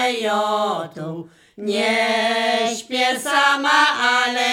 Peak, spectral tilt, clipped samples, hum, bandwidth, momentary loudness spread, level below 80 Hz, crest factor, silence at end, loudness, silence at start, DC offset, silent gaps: -2 dBFS; -2 dB/octave; under 0.1%; none; 17 kHz; 15 LU; -72 dBFS; 16 dB; 0 s; -18 LUFS; 0 s; under 0.1%; none